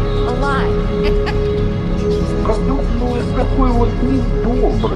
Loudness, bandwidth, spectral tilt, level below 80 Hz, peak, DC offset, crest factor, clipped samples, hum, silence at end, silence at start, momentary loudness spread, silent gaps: -17 LUFS; 9.2 kHz; -8 dB/octave; -18 dBFS; 0 dBFS; under 0.1%; 14 dB; under 0.1%; none; 0 s; 0 s; 3 LU; none